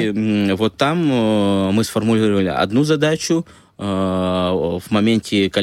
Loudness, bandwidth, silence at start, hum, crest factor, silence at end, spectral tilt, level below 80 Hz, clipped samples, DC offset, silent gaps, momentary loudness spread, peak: -18 LUFS; 15 kHz; 0 s; none; 14 dB; 0 s; -6 dB/octave; -50 dBFS; under 0.1%; under 0.1%; none; 5 LU; -4 dBFS